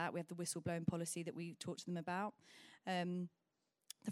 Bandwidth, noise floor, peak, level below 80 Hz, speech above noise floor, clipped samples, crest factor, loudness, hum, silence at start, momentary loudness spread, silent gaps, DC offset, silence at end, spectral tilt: 14.5 kHz; -85 dBFS; -24 dBFS; -80 dBFS; 41 dB; under 0.1%; 20 dB; -45 LUFS; none; 0 s; 10 LU; none; under 0.1%; 0 s; -5 dB/octave